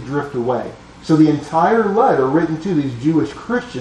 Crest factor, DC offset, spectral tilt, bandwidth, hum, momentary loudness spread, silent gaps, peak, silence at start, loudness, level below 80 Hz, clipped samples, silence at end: 14 dB; under 0.1%; -7.5 dB/octave; 9.2 kHz; none; 9 LU; none; -2 dBFS; 0 s; -17 LUFS; -48 dBFS; under 0.1%; 0 s